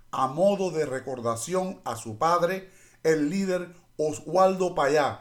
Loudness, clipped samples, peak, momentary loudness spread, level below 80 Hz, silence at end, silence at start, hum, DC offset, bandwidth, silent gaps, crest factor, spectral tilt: -26 LUFS; under 0.1%; -8 dBFS; 9 LU; -60 dBFS; 0 s; 0.15 s; none; under 0.1%; 17.5 kHz; none; 18 dB; -5 dB/octave